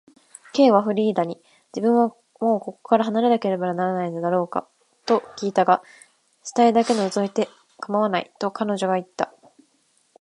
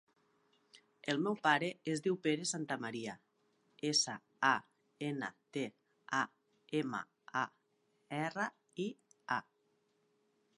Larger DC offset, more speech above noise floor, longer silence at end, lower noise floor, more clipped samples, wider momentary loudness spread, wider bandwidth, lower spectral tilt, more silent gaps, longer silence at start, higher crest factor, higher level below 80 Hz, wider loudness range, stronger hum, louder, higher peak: neither; about the same, 44 dB vs 41 dB; second, 0.95 s vs 1.15 s; second, -64 dBFS vs -78 dBFS; neither; about the same, 12 LU vs 12 LU; about the same, 11.5 kHz vs 11.5 kHz; first, -6 dB/octave vs -3.5 dB/octave; neither; second, 0.55 s vs 0.75 s; about the same, 20 dB vs 24 dB; first, -74 dBFS vs -88 dBFS; second, 3 LU vs 6 LU; neither; first, -22 LUFS vs -38 LUFS; first, -2 dBFS vs -16 dBFS